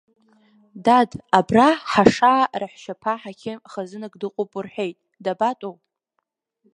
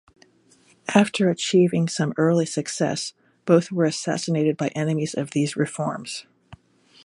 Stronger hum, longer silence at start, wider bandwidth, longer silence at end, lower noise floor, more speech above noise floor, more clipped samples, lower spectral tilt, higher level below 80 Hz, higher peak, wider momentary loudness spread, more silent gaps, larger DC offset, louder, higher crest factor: neither; about the same, 0.75 s vs 0.85 s; about the same, 11 kHz vs 11.5 kHz; first, 1.05 s vs 0.5 s; first, -76 dBFS vs -58 dBFS; first, 56 dB vs 36 dB; neither; about the same, -5.5 dB/octave vs -5.5 dB/octave; first, -58 dBFS vs -66 dBFS; about the same, 0 dBFS vs -2 dBFS; first, 17 LU vs 12 LU; neither; neither; about the same, -20 LUFS vs -22 LUFS; about the same, 22 dB vs 20 dB